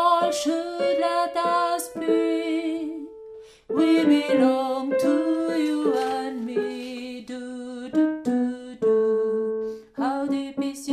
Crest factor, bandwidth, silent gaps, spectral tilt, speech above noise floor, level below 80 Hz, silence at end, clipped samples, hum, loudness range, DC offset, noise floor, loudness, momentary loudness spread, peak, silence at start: 16 dB; 15 kHz; none; -4.5 dB/octave; 23 dB; -66 dBFS; 0 s; under 0.1%; none; 4 LU; under 0.1%; -44 dBFS; -24 LUFS; 14 LU; -8 dBFS; 0 s